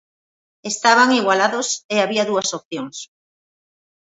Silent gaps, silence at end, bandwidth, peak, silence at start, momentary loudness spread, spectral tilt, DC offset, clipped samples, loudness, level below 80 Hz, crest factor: 1.84-1.89 s, 2.65-2.71 s; 1.1 s; 8.2 kHz; 0 dBFS; 0.65 s; 17 LU; -2 dB/octave; under 0.1%; under 0.1%; -17 LUFS; -72 dBFS; 20 dB